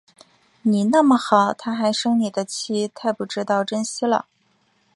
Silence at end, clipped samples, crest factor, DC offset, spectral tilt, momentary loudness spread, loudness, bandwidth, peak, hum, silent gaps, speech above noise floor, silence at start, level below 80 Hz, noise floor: 0.75 s; under 0.1%; 20 dB; under 0.1%; -4.5 dB/octave; 9 LU; -21 LUFS; 11.5 kHz; -2 dBFS; none; none; 44 dB; 0.65 s; -70 dBFS; -64 dBFS